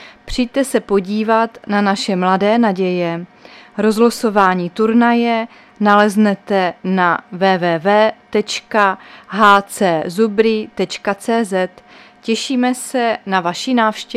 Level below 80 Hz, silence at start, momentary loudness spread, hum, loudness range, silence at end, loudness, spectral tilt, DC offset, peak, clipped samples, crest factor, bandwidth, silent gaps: -46 dBFS; 0 s; 8 LU; none; 3 LU; 0 s; -15 LUFS; -5 dB/octave; under 0.1%; 0 dBFS; under 0.1%; 16 dB; 14.5 kHz; none